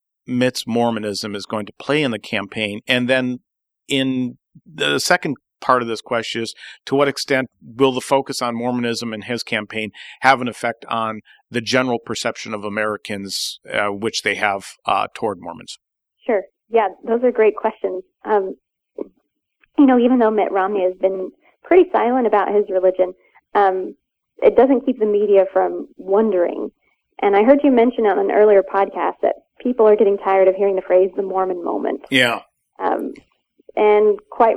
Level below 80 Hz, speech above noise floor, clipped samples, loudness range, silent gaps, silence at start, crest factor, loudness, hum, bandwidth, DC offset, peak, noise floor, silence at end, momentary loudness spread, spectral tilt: -60 dBFS; 51 dB; under 0.1%; 6 LU; none; 0.3 s; 18 dB; -18 LUFS; none; 14.5 kHz; under 0.1%; 0 dBFS; -68 dBFS; 0 s; 13 LU; -4.5 dB/octave